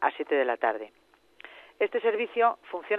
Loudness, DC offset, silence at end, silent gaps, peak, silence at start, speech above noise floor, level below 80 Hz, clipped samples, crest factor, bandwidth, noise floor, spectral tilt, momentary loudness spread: -28 LUFS; under 0.1%; 0 s; none; -10 dBFS; 0 s; 25 dB; -80 dBFS; under 0.1%; 18 dB; 4.2 kHz; -52 dBFS; -5 dB/octave; 22 LU